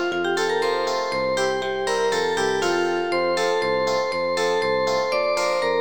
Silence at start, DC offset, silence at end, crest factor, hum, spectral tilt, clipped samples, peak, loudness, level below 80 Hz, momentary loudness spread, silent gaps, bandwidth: 0 s; 0.5%; 0 s; 12 dB; none; -3 dB/octave; under 0.1%; -10 dBFS; -22 LUFS; -56 dBFS; 2 LU; none; 19 kHz